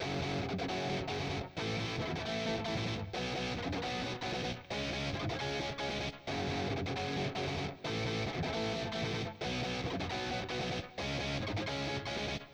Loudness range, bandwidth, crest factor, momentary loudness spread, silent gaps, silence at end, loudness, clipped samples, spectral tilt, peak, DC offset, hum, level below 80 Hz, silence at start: 1 LU; over 20 kHz; 12 dB; 2 LU; none; 0 s; -37 LUFS; under 0.1%; -5 dB/octave; -24 dBFS; under 0.1%; none; -54 dBFS; 0 s